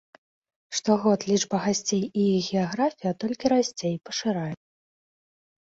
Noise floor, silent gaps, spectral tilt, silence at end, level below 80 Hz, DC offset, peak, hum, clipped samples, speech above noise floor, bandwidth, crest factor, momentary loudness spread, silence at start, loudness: under -90 dBFS; none; -5 dB/octave; 1.25 s; -66 dBFS; under 0.1%; -8 dBFS; none; under 0.1%; over 65 dB; 8 kHz; 20 dB; 8 LU; 0.7 s; -25 LUFS